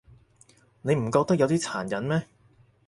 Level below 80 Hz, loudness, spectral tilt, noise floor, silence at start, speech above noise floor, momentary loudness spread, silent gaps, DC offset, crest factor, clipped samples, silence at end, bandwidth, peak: -60 dBFS; -26 LUFS; -6 dB/octave; -60 dBFS; 0.85 s; 35 dB; 7 LU; none; under 0.1%; 20 dB; under 0.1%; 0.65 s; 11.5 kHz; -8 dBFS